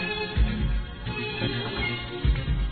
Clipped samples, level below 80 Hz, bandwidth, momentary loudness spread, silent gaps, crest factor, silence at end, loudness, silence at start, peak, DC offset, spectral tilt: under 0.1%; -30 dBFS; 4.6 kHz; 5 LU; none; 14 dB; 0 s; -28 LUFS; 0 s; -12 dBFS; 0.1%; -9 dB/octave